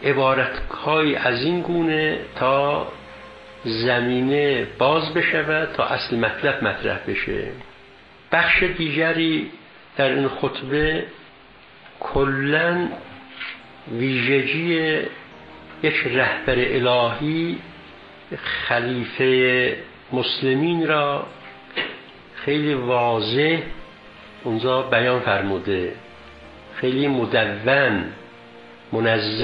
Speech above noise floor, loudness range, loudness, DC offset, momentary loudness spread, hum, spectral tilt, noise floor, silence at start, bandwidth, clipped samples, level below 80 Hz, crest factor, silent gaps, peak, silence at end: 27 dB; 3 LU; -21 LUFS; under 0.1%; 15 LU; none; -8 dB/octave; -47 dBFS; 0 s; 6 kHz; under 0.1%; -46 dBFS; 20 dB; none; -2 dBFS; 0 s